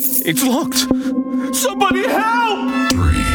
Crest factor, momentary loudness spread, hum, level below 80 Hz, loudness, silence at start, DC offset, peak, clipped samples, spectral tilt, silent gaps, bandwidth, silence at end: 14 dB; 4 LU; none; -30 dBFS; -16 LUFS; 0 s; under 0.1%; -2 dBFS; under 0.1%; -4 dB/octave; none; over 20 kHz; 0 s